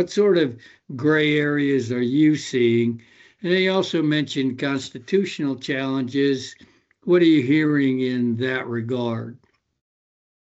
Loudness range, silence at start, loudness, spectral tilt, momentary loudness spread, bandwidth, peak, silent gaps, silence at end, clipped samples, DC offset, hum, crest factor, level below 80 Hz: 3 LU; 0 s; -21 LUFS; -6 dB/octave; 10 LU; 8 kHz; -6 dBFS; none; 1.25 s; under 0.1%; under 0.1%; none; 14 dB; -70 dBFS